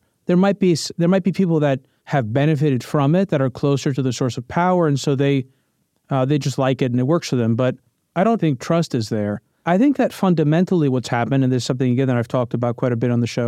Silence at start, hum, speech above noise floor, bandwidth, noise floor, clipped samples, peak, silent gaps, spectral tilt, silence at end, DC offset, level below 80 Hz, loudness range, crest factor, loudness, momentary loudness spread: 0.3 s; none; 49 dB; 14 kHz; -67 dBFS; under 0.1%; -6 dBFS; none; -7 dB/octave; 0 s; under 0.1%; -58 dBFS; 2 LU; 12 dB; -19 LUFS; 6 LU